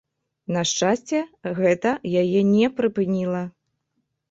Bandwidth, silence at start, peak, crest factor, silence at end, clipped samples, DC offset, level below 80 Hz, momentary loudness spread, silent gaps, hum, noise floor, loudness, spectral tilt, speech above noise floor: 8 kHz; 0.5 s; -6 dBFS; 16 dB; 0.8 s; under 0.1%; under 0.1%; -62 dBFS; 10 LU; none; none; -75 dBFS; -22 LUFS; -5 dB/octave; 54 dB